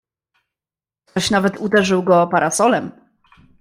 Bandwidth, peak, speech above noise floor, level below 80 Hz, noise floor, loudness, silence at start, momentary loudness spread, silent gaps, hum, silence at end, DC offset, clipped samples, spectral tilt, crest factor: 15.5 kHz; -2 dBFS; over 74 dB; -54 dBFS; under -90 dBFS; -17 LUFS; 1.15 s; 7 LU; none; none; 0.7 s; under 0.1%; under 0.1%; -4.5 dB/octave; 16 dB